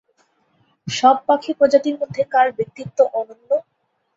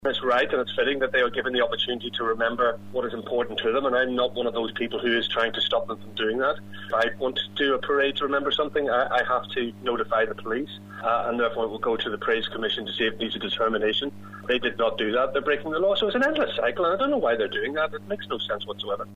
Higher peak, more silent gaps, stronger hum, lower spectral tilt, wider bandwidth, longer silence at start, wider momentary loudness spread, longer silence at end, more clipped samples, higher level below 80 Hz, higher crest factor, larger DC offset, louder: first, 0 dBFS vs -10 dBFS; neither; neither; about the same, -4.5 dB/octave vs -5 dB/octave; second, 7.8 kHz vs 10.5 kHz; first, 0.85 s vs 0 s; first, 11 LU vs 7 LU; first, 0.55 s vs 0 s; neither; second, -64 dBFS vs -56 dBFS; about the same, 20 dB vs 16 dB; neither; first, -19 LUFS vs -25 LUFS